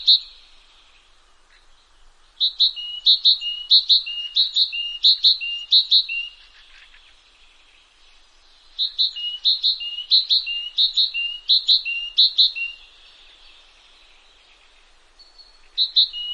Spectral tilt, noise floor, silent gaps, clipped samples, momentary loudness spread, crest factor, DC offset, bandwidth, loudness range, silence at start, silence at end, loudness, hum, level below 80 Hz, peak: 3.5 dB/octave; -54 dBFS; none; under 0.1%; 11 LU; 18 dB; under 0.1%; 9.4 kHz; 9 LU; 0 s; 0 s; -17 LUFS; none; -58 dBFS; -4 dBFS